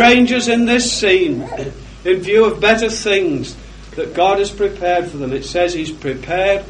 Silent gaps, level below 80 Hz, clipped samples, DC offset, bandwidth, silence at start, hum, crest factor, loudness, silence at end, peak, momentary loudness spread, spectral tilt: none; -38 dBFS; under 0.1%; under 0.1%; 10.5 kHz; 0 s; none; 16 dB; -15 LUFS; 0 s; 0 dBFS; 13 LU; -3.5 dB/octave